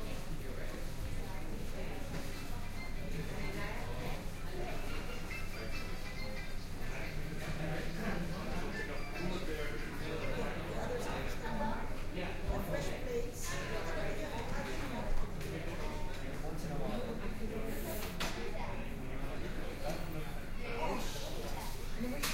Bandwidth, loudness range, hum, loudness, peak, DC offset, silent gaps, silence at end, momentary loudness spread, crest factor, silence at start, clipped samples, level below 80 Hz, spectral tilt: 16 kHz; 3 LU; none; -42 LUFS; -22 dBFS; under 0.1%; none; 0 s; 5 LU; 16 dB; 0 s; under 0.1%; -40 dBFS; -5 dB/octave